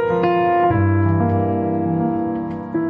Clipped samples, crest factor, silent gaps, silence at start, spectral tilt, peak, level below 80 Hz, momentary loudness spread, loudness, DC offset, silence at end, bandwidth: under 0.1%; 12 dB; none; 0 s; -8 dB/octave; -6 dBFS; -46 dBFS; 7 LU; -18 LUFS; under 0.1%; 0 s; 5 kHz